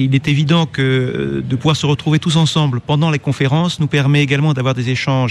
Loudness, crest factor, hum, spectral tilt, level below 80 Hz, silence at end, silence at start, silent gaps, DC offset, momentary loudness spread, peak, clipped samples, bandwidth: -15 LUFS; 12 dB; none; -6 dB/octave; -48 dBFS; 0 s; 0 s; none; under 0.1%; 4 LU; -2 dBFS; under 0.1%; 11 kHz